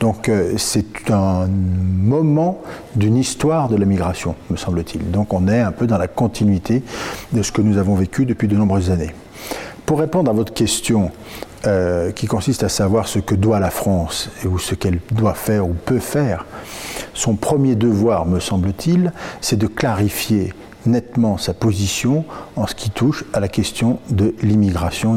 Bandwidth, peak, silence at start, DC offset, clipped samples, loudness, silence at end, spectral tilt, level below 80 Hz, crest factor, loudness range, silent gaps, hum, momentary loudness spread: 16.5 kHz; -4 dBFS; 0 s; under 0.1%; under 0.1%; -18 LUFS; 0 s; -6 dB/octave; -40 dBFS; 12 dB; 2 LU; none; none; 8 LU